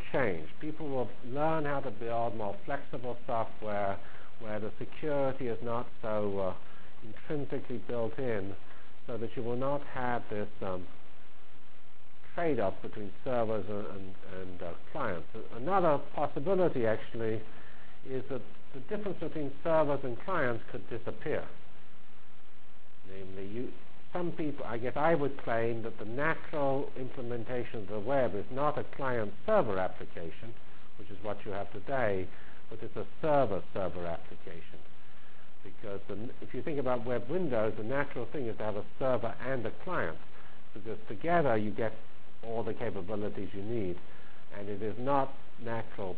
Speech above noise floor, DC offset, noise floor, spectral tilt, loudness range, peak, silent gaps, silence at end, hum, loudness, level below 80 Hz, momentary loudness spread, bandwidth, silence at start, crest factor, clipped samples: 26 dB; 4%; -61 dBFS; -10 dB/octave; 5 LU; -16 dBFS; none; 0 s; none; -35 LUFS; -58 dBFS; 18 LU; 4 kHz; 0 s; 22 dB; under 0.1%